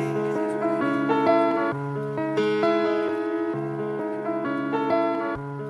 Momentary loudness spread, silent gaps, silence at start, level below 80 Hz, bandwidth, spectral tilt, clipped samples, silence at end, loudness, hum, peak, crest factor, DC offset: 8 LU; none; 0 s; -64 dBFS; 11 kHz; -7.5 dB/octave; under 0.1%; 0 s; -25 LUFS; none; -8 dBFS; 16 dB; under 0.1%